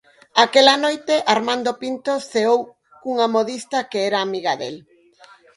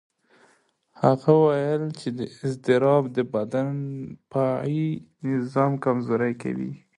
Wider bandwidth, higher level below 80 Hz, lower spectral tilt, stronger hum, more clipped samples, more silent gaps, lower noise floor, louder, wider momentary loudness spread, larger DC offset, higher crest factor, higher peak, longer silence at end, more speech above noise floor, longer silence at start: about the same, 11.5 kHz vs 11 kHz; about the same, -70 dBFS vs -66 dBFS; second, -2.5 dB/octave vs -8.5 dB/octave; neither; neither; neither; second, -50 dBFS vs -64 dBFS; first, -19 LUFS vs -24 LUFS; about the same, 13 LU vs 12 LU; neither; about the same, 20 dB vs 20 dB; first, 0 dBFS vs -4 dBFS; first, 0.8 s vs 0.2 s; second, 31 dB vs 40 dB; second, 0.35 s vs 1 s